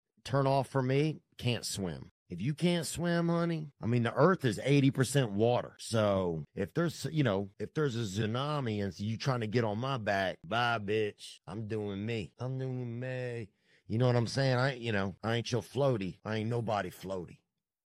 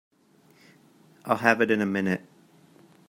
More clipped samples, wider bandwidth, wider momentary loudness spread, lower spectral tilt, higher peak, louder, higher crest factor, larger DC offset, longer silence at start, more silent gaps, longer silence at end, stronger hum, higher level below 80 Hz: neither; about the same, 15 kHz vs 16 kHz; about the same, 9 LU vs 11 LU; about the same, -6 dB/octave vs -6 dB/octave; second, -12 dBFS vs -2 dBFS; second, -32 LUFS vs -25 LUFS; second, 20 dB vs 26 dB; neither; second, 0.25 s vs 1.25 s; first, 2.11-2.26 s vs none; second, 0.55 s vs 0.9 s; neither; first, -66 dBFS vs -74 dBFS